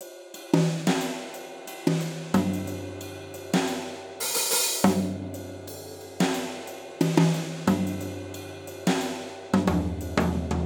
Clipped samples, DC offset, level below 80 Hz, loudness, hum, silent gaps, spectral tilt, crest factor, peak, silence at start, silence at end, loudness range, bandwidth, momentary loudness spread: under 0.1%; under 0.1%; -46 dBFS; -27 LUFS; none; none; -4.5 dB/octave; 22 dB; -4 dBFS; 0 s; 0 s; 2 LU; over 20 kHz; 16 LU